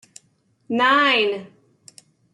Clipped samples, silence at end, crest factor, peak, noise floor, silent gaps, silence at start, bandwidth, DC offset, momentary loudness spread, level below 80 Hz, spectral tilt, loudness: under 0.1%; 0.9 s; 18 dB; -6 dBFS; -64 dBFS; none; 0.7 s; 12 kHz; under 0.1%; 12 LU; -76 dBFS; -3 dB/octave; -18 LUFS